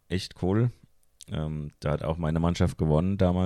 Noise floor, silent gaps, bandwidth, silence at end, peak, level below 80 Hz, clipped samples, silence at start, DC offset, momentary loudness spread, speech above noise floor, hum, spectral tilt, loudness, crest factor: -53 dBFS; none; 12 kHz; 0 s; -8 dBFS; -42 dBFS; under 0.1%; 0.1 s; under 0.1%; 9 LU; 27 dB; none; -7.5 dB/octave; -28 LUFS; 18 dB